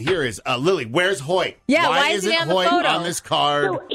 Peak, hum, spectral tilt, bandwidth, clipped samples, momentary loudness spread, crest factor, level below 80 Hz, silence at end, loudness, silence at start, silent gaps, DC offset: -6 dBFS; none; -3.5 dB/octave; 16 kHz; under 0.1%; 5 LU; 14 dB; -56 dBFS; 0 s; -19 LUFS; 0 s; none; under 0.1%